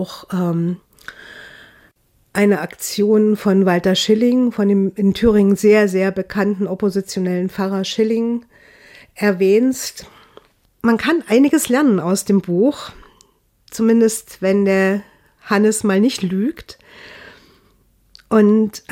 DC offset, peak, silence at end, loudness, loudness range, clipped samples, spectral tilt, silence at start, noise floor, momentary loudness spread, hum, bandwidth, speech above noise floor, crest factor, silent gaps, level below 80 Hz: under 0.1%; -4 dBFS; 0.1 s; -16 LUFS; 5 LU; under 0.1%; -5.5 dB/octave; 0 s; -56 dBFS; 12 LU; none; 16.5 kHz; 40 dB; 14 dB; none; -48 dBFS